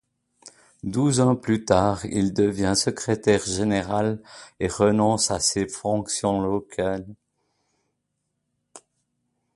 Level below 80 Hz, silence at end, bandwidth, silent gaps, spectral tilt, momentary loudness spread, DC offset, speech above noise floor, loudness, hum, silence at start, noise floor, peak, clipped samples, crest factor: -48 dBFS; 0.8 s; 11.5 kHz; none; -4.5 dB/octave; 8 LU; under 0.1%; 55 dB; -23 LUFS; none; 0.45 s; -77 dBFS; -2 dBFS; under 0.1%; 22 dB